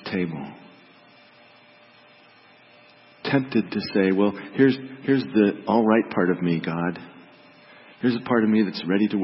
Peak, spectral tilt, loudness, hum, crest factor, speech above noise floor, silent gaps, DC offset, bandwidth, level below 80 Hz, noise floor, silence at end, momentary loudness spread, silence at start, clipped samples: -6 dBFS; -11 dB/octave; -23 LUFS; none; 18 dB; 31 dB; none; under 0.1%; 5.8 kHz; -66 dBFS; -53 dBFS; 0 s; 9 LU; 0.05 s; under 0.1%